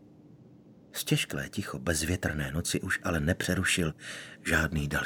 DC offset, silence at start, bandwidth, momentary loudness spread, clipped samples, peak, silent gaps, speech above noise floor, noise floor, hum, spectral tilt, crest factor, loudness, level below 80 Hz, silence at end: under 0.1%; 0.1 s; 19.5 kHz; 9 LU; under 0.1%; -10 dBFS; none; 24 dB; -55 dBFS; none; -4 dB/octave; 22 dB; -30 LUFS; -46 dBFS; 0 s